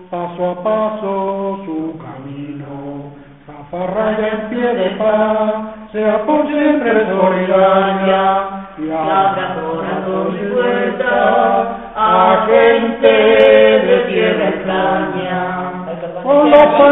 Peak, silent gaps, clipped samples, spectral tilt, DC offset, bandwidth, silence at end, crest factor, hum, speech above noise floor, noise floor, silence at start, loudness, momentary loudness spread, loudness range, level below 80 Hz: 0 dBFS; none; under 0.1%; -3.5 dB/octave; 0.2%; 4 kHz; 0 s; 14 dB; none; 23 dB; -36 dBFS; 0 s; -14 LUFS; 16 LU; 10 LU; -48 dBFS